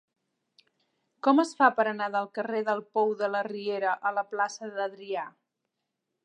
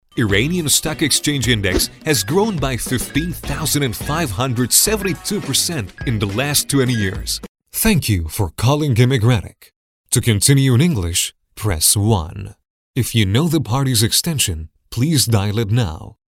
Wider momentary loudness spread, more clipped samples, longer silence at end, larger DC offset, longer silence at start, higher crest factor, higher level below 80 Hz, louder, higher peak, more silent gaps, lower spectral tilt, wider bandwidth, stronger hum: about the same, 11 LU vs 10 LU; neither; first, 0.95 s vs 0.3 s; neither; first, 1.25 s vs 0.15 s; about the same, 22 dB vs 18 dB; second, -88 dBFS vs -34 dBFS; second, -28 LUFS vs -17 LUFS; second, -8 dBFS vs 0 dBFS; second, none vs 7.48-7.55 s, 9.76-10.04 s, 12.70-12.94 s; about the same, -4.5 dB/octave vs -4 dB/octave; second, 10.5 kHz vs 17 kHz; neither